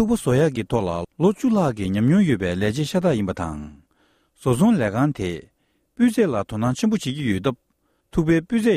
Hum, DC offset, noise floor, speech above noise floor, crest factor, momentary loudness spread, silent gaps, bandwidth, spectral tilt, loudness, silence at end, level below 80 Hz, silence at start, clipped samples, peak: none; under 0.1%; -63 dBFS; 43 dB; 14 dB; 10 LU; none; 15 kHz; -7 dB/octave; -21 LUFS; 0 s; -46 dBFS; 0 s; under 0.1%; -6 dBFS